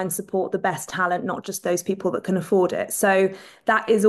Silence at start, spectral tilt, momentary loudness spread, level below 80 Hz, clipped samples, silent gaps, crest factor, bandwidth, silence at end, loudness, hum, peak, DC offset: 0 s; -4.5 dB/octave; 6 LU; -66 dBFS; under 0.1%; none; 16 dB; 13 kHz; 0 s; -23 LUFS; none; -6 dBFS; under 0.1%